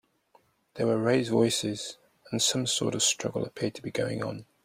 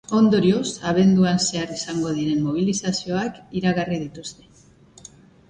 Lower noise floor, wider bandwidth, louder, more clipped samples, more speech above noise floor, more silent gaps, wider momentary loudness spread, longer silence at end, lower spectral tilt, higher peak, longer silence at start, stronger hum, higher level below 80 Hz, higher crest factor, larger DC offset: first, -65 dBFS vs -51 dBFS; first, 16 kHz vs 9.4 kHz; second, -28 LUFS vs -21 LUFS; neither; first, 37 dB vs 30 dB; neither; about the same, 10 LU vs 11 LU; second, 0.2 s vs 1.15 s; second, -3.5 dB/octave vs -5.5 dB/octave; second, -12 dBFS vs -6 dBFS; first, 0.75 s vs 0.1 s; neither; second, -66 dBFS vs -54 dBFS; about the same, 18 dB vs 16 dB; neither